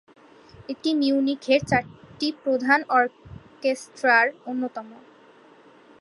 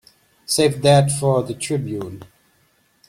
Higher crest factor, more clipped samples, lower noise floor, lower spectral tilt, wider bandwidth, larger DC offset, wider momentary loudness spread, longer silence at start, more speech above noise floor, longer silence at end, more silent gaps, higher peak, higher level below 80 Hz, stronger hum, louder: about the same, 20 dB vs 18 dB; neither; second, -52 dBFS vs -61 dBFS; about the same, -5 dB/octave vs -5 dB/octave; second, 11.5 kHz vs 14.5 kHz; neither; second, 13 LU vs 19 LU; about the same, 0.6 s vs 0.5 s; second, 29 dB vs 43 dB; first, 1.05 s vs 0.85 s; neither; second, -6 dBFS vs -2 dBFS; about the same, -58 dBFS vs -54 dBFS; neither; second, -23 LUFS vs -19 LUFS